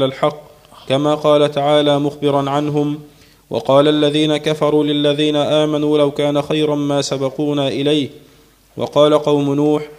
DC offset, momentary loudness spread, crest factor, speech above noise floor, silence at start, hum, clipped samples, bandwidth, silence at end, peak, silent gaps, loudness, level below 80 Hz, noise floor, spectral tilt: under 0.1%; 7 LU; 16 dB; 34 dB; 0 s; none; under 0.1%; 14.5 kHz; 0.05 s; 0 dBFS; none; -16 LUFS; -56 dBFS; -49 dBFS; -6 dB/octave